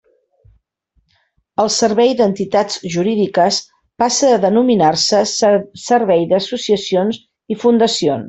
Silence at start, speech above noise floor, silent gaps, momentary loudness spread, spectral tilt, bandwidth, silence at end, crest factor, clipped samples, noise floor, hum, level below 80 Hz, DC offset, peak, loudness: 1.6 s; 49 dB; none; 7 LU; -4 dB/octave; 8.4 kHz; 0 s; 14 dB; under 0.1%; -63 dBFS; none; -58 dBFS; under 0.1%; -2 dBFS; -15 LUFS